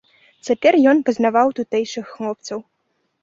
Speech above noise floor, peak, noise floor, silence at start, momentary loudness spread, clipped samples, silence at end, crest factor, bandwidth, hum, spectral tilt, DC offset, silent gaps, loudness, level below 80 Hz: 52 dB; -2 dBFS; -70 dBFS; 0.45 s; 16 LU; under 0.1%; 0.6 s; 18 dB; 7.8 kHz; none; -4.5 dB/octave; under 0.1%; none; -18 LUFS; -66 dBFS